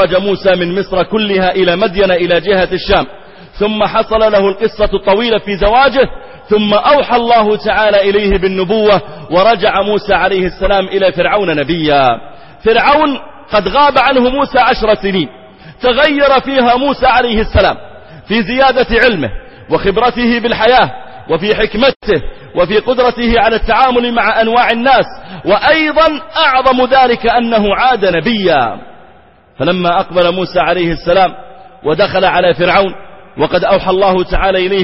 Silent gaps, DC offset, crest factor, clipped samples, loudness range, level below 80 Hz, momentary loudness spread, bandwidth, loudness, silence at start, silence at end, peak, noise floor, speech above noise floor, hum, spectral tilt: 21.96-22.00 s; under 0.1%; 12 dB; under 0.1%; 2 LU; -30 dBFS; 7 LU; 6 kHz; -11 LUFS; 0 s; 0 s; 0 dBFS; -43 dBFS; 32 dB; none; -7.5 dB/octave